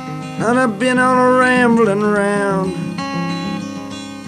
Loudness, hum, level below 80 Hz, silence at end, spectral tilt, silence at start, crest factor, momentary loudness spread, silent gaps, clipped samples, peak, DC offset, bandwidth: -15 LUFS; none; -52 dBFS; 0 s; -5.5 dB/octave; 0 s; 14 dB; 14 LU; none; under 0.1%; -2 dBFS; under 0.1%; 12.5 kHz